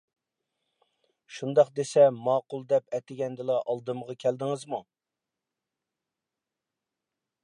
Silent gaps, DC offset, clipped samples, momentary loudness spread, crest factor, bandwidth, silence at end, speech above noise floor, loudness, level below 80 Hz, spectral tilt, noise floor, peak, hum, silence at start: none; under 0.1%; under 0.1%; 15 LU; 22 dB; 11 kHz; 2.6 s; 62 dB; -27 LUFS; -84 dBFS; -6 dB/octave; -89 dBFS; -8 dBFS; none; 1.3 s